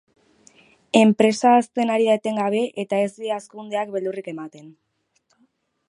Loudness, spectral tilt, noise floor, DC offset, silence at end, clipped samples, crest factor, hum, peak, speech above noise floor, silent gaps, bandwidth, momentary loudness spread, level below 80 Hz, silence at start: -21 LUFS; -5 dB/octave; -68 dBFS; under 0.1%; 1.2 s; under 0.1%; 22 dB; none; 0 dBFS; 47 dB; none; 11 kHz; 14 LU; -74 dBFS; 0.95 s